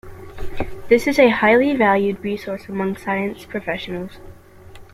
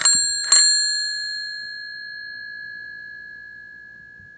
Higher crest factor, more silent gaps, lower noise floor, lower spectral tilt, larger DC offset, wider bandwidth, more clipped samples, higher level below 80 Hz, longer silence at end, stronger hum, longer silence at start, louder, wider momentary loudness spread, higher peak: second, 18 dB vs 24 dB; neither; about the same, -41 dBFS vs -43 dBFS; first, -6 dB/octave vs 3.5 dB/octave; neither; first, 15.5 kHz vs 10 kHz; neither; first, -40 dBFS vs -66 dBFS; about the same, 0.1 s vs 0 s; second, none vs 60 Hz at -65 dBFS; about the same, 0.05 s vs 0 s; about the same, -19 LUFS vs -17 LUFS; second, 17 LU vs 25 LU; about the same, -2 dBFS vs 0 dBFS